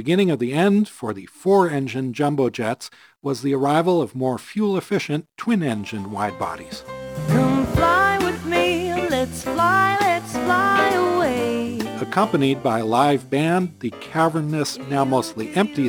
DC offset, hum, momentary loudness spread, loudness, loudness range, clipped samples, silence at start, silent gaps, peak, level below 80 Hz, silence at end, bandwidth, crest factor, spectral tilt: under 0.1%; none; 10 LU; -21 LUFS; 3 LU; under 0.1%; 0 s; none; -2 dBFS; -46 dBFS; 0 s; over 20 kHz; 18 dB; -6 dB/octave